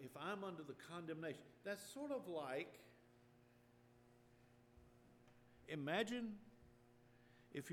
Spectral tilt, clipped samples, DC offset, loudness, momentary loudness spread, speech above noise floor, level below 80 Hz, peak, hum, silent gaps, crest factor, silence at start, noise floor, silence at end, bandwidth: -5 dB/octave; under 0.1%; under 0.1%; -49 LUFS; 16 LU; 23 dB; -82 dBFS; -30 dBFS; none; none; 22 dB; 0 s; -71 dBFS; 0 s; 18 kHz